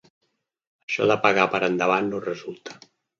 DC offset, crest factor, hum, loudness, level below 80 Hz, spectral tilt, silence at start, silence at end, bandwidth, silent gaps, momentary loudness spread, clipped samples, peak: under 0.1%; 24 dB; none; -22 LUFS; -68 dBFS; -5 dB/octave; 0.9 s; 0.45 s; 7.6 kHz; none; 18 LU; under 0.1%; -2 dBFS